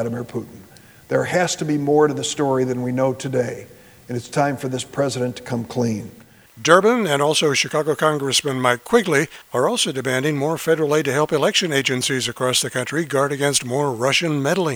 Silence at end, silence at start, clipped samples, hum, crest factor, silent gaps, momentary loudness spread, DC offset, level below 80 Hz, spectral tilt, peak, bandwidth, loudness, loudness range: 0 s; 0 s; under 0.1%; none; 20 dB; none; 9 LU; under 0.1%; -60 dBFS; -4 dB/octave; 0 dBFS; over 20 kHz; -19 LUFS; 5 LU